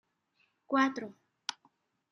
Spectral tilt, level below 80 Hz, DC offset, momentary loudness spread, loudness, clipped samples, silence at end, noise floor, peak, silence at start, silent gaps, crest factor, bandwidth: -3 dB/octave; -90 dBFS; under 0.1%; 14 LU; -33 LUFS; under 0.1%; 0.6 s; -75 dBFS; -14 dBFS; 0.7 s; none; 22 dB; 11 kHz